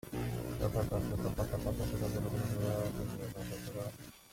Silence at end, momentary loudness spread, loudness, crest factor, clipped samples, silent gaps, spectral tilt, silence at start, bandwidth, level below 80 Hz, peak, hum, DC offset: 0 s; 7 LU; -38 LUFS; 18 dB; under 0.1%; none; -6.5 dB/octave; 0.05 s; 16.5 kHz; -48 dBFS; -20 dBFS; none; under 0.1%